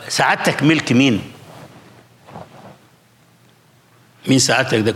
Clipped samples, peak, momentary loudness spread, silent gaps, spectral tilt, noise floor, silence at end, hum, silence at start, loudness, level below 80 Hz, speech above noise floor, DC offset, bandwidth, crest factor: under 0.1%; -2 dBFS; 24 LU; none; -4 dB/octave; -52 dBFS; 0 s; none; 0 s; -15 LUFS; -60 dBFS; 37 dB; under 0.1%; 16 kHz; 16 dB